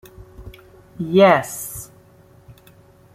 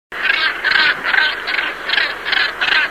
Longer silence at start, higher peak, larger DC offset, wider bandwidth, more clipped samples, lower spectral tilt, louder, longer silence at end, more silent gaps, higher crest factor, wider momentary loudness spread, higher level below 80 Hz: first, 0.4 s vs 0.1 s; about the same, -2 dBFS vs -2 dBFS; second, under 0.1% vs 0.3%; about the same, 16 kHz vs 16 kHz; neither; first, -5 dB/octave vs -1 dB/octave; about the same, -17 LUFS vs -15 LUFS; first, 1.3 s vs 0 s; neither; about the same, 20 dB vs 16 dB; first, 26 LU vs 5 LU; about the same, -50 dBFS vs -52 dBFS